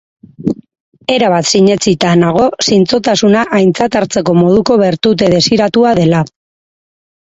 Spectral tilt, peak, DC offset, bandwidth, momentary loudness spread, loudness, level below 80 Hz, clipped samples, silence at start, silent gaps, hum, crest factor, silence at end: -5 dB/octave; 0 dBFS; under 0.1%; 8.2 kHz; 10 LU; -10 LUFS; -46 dBFS; under 0.1%; 0.4 s; 0.80-0.92 s; none; 10 dB; 1.1 s